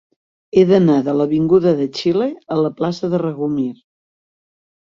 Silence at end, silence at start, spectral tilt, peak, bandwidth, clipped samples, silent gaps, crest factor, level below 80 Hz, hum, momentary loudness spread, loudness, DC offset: 1.1 s; 0.55 s; -8 dB/octave; -2 dBFS; 7.4 kHz; under 0.1%; none; 16 dB; -56 dBFS; none; 8 LU; -17 LUFS; under 0.1%